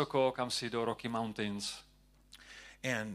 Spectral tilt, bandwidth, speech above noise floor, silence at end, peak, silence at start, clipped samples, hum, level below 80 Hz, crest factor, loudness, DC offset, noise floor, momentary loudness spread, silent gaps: -4 dB/octave; 14.5 kHz; 26 dB; 0 s; -16 dBFS; 0 s; under 0.1%; none; -66 dBFS; 20 dB; -36 LUFS; under 0.1%; -61 dBFS; 20 LU; none